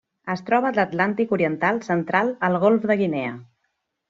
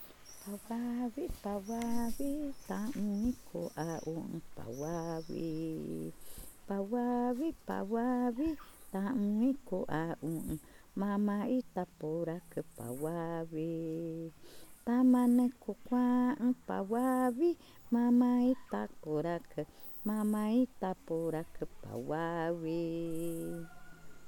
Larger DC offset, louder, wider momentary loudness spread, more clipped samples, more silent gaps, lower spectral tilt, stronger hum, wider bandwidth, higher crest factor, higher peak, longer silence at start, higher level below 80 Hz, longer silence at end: neither; first, -22 LUFS vs -35 LUFS; second, 10 LU vs 14 LU; neither; neither; second, -5.5 dB/octave vs -7 dB/octave; neither; second, 7.6 kHz vs 19 kHz; about the same, 20 dB vs 16 dB; first, -2 dBFS vs -20 dBFS; first, 0.25 s vs 0 s; second, -66 dBFS vs -58 dBFS; first, 0.65 s vs 0 s